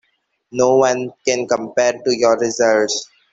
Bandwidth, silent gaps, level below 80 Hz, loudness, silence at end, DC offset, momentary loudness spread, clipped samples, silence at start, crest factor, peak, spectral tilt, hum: 8 kHz; none; -62 dBFS; -17 LUFS; 0.3 s; under 0.1%; 6 LU; under 0.1%; 0.55 s; 16 dB; -2 dBFS; -3 dB/octave; none